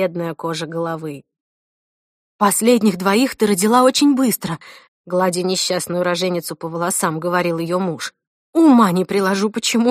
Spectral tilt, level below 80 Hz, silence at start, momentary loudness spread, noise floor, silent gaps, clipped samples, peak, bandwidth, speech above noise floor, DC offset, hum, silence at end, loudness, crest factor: -4.5 dB/octave; -64 dBFS; 0 s; 12 LU; under -90 dBFS; 1.40-2.39 s, 4.88-5.04 s, 8.27-8.53 s; under 0.1%; 0 dBFS; 15.5 kHz; over 73 dB; under 0.1%; none; 0 s; -17 LUFS; 18 dB